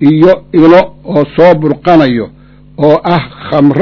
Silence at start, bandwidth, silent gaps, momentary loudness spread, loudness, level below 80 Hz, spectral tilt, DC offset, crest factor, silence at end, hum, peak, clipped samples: 0 s; 6 kHz; none; 8 LU; -8 LUFS; -40 dBFS; -9 dB/octave; under 0.1%; 8 dB; 0 s; none; 0 dBFS; 8%